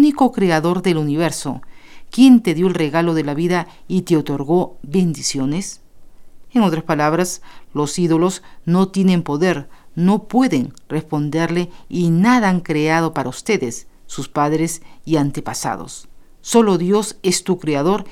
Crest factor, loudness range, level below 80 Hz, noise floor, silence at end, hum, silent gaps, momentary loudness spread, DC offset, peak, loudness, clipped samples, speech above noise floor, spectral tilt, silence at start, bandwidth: 18 dB; 4 LU; -46 dBFS; -37 dBFS; 0 s; none; none; 12 LU; under 0.1%; 0 dBFS; -18 LUFS; under 0.1%; 20 dB; -5.5 dB/octave; 0 s; 15.5 kHz